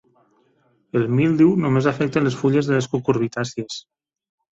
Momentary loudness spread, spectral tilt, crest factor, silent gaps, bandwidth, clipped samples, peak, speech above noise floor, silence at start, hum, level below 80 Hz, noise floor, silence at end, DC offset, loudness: 11 LU; -7 dB/octave; 16 dB; none; 7.8 kHz; under 0.1%; -4 dBFS; 43 dB; 0.95 s; none; -58 dBFS; -62 dBFS; 0.75 s; under 0.1%; -20 LUFS